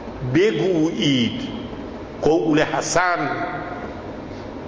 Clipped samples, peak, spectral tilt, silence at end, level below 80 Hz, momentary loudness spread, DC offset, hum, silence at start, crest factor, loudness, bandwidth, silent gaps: under 0.1%; -6 dBFS; -5 dB/octave; 0 s; -44 dBFS; 15 LU; under 0.1%; none; 0 s; 16 dB; -21 LUFS; 8 kHz; none